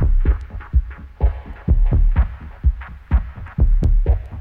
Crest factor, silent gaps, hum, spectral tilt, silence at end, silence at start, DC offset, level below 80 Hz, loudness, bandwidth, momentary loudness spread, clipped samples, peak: 12 dB; none; none; -10 dB/octave; 0 s; 0 s; under 0.1%; -18 dBFS; -21 LUFS; 3.2 kHz; 8 LU; under 0.1%; -4 dBFS